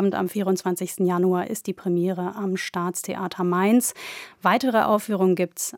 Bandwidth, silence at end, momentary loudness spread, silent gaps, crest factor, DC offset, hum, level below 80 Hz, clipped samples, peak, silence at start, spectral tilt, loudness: 18 kHz; 0 s; 8 LU; none; 18 dB; under 0.1%; none; -72 dBFS; under 0.1%; -6 dBFS; 0 s; -5 dB/octave; -23 LUFS